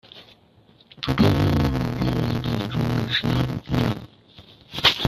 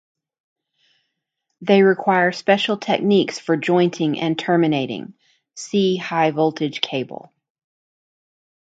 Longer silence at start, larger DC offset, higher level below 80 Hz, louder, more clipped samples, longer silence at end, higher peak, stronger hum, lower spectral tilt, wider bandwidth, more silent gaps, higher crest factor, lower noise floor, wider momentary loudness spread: second, 0.15 s vs 1.6 s; neither; first, -40 dBFS vs -68 dBFS; second, -23 LUFS vs -19 LUFS; neither; second, 0 s vs 1.55 s; about the same, -2 dBFS vs -2 dBFS; neither; about the same, -6 dB/octave vs -5.5 dB/octave; first, 15 kHz vs 8 kHz; neither; about the same, 20 dB vs 20 dB; second, -55 dBFS vs -77 dBFS; second, 8 LU vs 13 LU